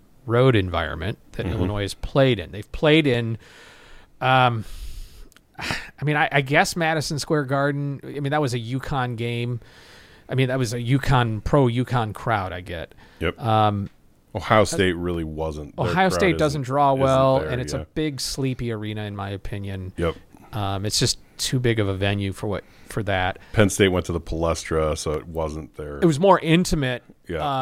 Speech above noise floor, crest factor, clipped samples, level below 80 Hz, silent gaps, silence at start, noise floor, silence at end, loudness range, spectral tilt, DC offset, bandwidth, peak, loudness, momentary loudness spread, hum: 23 dB; 22 dB; under 0.1%; -40 dBFS; none; 0.25 s; -45 dBFS; 0 s; 4 LU; -5.5 dB/octave; under 0.1%; 16 kHz; -2 dBFS; -23 LUFS; 13 LU; none